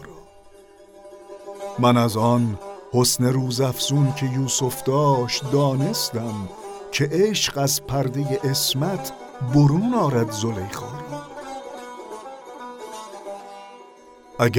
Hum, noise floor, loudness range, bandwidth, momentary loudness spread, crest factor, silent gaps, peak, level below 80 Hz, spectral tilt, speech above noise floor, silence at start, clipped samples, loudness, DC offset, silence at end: none; -48 dBFS; 11 LU; 19 kHz; 18 LU; 18 dB; none; -4 dBFS; -52 dBFS; -5 dB/octave; 27 dB; 0 s; under 0.1%; -21 LUFS; under 0.1%; 0 s